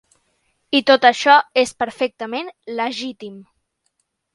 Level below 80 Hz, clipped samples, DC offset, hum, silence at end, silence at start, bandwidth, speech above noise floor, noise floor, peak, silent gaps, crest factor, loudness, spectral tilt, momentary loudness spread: -66 dBFS; under 0.1%; under 0.1%; none; 0.95 s; 0.7 s; 11.5 kHz; 53 dB; -70 dBFS; 0 dBFS; none; 20 dB; -17 LUFS; -2.5 dB/octave; 17 LU